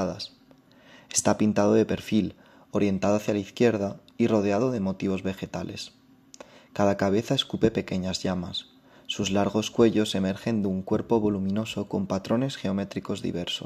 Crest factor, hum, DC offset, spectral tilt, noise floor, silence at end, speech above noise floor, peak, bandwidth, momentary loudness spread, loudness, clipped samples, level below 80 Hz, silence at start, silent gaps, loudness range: 22 dB; none; under 0.1%; -5 dB/octave; -56 dBFS; 0 s; 30 dB; -6 dBFS; 14.5 kHz; 12 LU; -26 LUFS; under 0.1%; -60 dBFS; 0 s; none; 3 LU